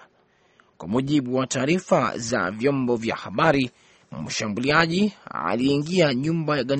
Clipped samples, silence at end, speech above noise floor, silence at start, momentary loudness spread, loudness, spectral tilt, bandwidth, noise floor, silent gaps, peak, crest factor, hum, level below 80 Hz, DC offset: under 0.1%; 0 s; 39 dB; 0.8 s; 8 LU; -23 LUFS; -5 dB/octave; 8.8 kHz; -61 dBFS; none; -2 dBFS; 22 dB; none; -56 dBFS; under 0.1%